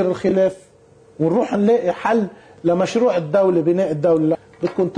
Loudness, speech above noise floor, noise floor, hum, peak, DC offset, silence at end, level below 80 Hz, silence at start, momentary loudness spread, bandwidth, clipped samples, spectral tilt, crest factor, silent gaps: -18 LUFS; 32 dB; -49 dBFS; none; -6 dBFS; under 0.1%; 0 s; -58 dBFS; 0 s; 6 LU; 10 kHz; under 0.1%; -7.5 dB/octave; 12 dB; none